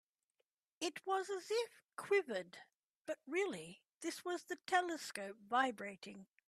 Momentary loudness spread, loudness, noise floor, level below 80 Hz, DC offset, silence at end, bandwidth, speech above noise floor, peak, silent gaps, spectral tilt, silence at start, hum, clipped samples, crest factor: 16 LU; -41 LUFS; -88 dBFS; under -90 dBFS; under 0.1%; 0.25 s; 14.5 kHz; 47 dB; -20 dBFS; 2.76-3.05 s; -3 dB/octave; 0.8 s; none; under 0.1%; 22 dB